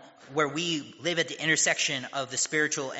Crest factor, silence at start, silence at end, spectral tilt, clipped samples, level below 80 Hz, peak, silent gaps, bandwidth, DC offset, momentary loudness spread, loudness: 18 dB; 0 s; 0 s; -1.5 dB/octave; under 0.1%; -76 dBFS; -10 dBFS; none; 8 kHz; under 0.1%; 8 LU; -27 LUFS